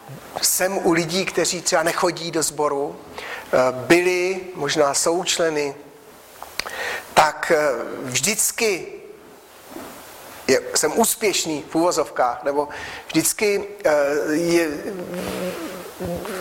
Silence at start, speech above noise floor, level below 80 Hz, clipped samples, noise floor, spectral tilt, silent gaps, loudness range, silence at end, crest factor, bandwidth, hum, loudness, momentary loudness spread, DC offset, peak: 0 s; 24 dB; -56 dBFS; under 0.1%; -45 dBFS; -2.5 dB/octave; none; 2 LU; 0 s; 18 dB; 16.5 kHz; none; -21 LUFS; 14 LU; under 0.1%; -4 dBFS